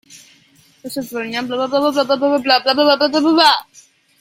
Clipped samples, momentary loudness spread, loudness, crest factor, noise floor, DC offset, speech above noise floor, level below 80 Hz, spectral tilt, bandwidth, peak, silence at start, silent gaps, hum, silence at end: under 0.1%; 13 LU; -15 LUFS; 16 dB; -52 dBFS; under 0.1%; 37 dB; -62 dBFS; -3 dB/octave; 16.5 kHz; 0 dBFS; 0.1 s; none; none; 0.6 s